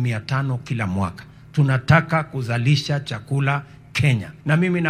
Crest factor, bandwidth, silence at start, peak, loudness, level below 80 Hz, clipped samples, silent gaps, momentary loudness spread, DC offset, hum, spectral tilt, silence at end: 20 dB; 11 kHz; 0 s; 0 dBFS; -21 LUFS; -50 dBFS; under 0.1%; none; 10 LU; under 0.1%; none; -6.5 dB/octave; 0 s